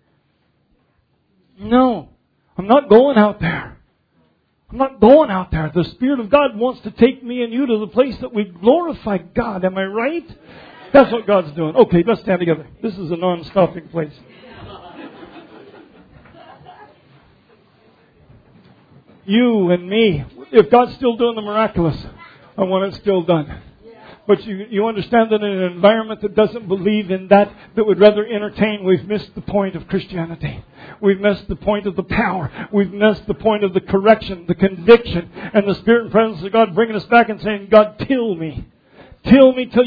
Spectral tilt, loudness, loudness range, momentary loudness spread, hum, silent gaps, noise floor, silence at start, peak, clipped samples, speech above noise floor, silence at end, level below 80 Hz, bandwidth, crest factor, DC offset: -9.5 dB/octave; -16 LUFS; 5 LU; 14 LU; none; none; -62 dBFS; 1.6 s; 0 dBFS; under 0.1%; 47 dB; 0 s; -44 dBFS; 5.2 kHz; 16 dB; under 0.1%